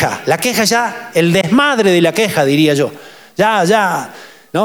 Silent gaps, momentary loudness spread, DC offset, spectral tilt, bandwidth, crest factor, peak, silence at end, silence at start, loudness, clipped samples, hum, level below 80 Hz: none; 10 LU; under 0.1%; -4.5 dB/octave; over 20 kHz; 12 dB; -2 dBFS; 0 s; 0 s; -13 LUFS; under 0.1%; none; -54 dBFS